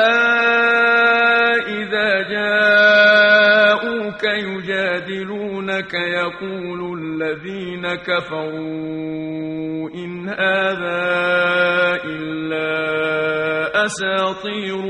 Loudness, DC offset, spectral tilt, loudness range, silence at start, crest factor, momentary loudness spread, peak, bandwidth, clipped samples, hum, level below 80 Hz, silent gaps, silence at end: -17 LUFS; under 0.1%; -4.5 dB/octave; 11 LU; 0 s; 16 dB; 15 LU; -2 dBFS; 11 kHz; under 0.1%; none; -58 dBFS; none; 0 s